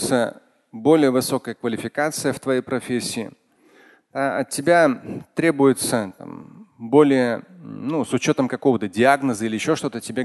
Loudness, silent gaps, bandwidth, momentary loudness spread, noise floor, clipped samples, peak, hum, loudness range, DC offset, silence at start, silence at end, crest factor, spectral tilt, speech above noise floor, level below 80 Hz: -21 LUFS; none; 12.5 kHz; 14 LU; -54 dBFS; under 0.1%; -2 dBFS; none; 4 LU; under 0.1%; 0 s; 0 s; 20 dB; -5 dB/octave; 33 dB; -62 dBFS